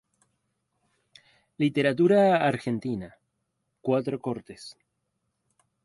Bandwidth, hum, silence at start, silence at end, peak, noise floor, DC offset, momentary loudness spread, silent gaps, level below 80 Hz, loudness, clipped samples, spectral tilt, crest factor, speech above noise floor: 11.5 kHz; none; 1.6 s; 1.15 s; -10 dBFS; -78 dBFS; under 0.1%; 24 LU; none; -66 dBFS; -25 LUFS; under 0.1%; -7 dB/octave; 18 dB; 54 dB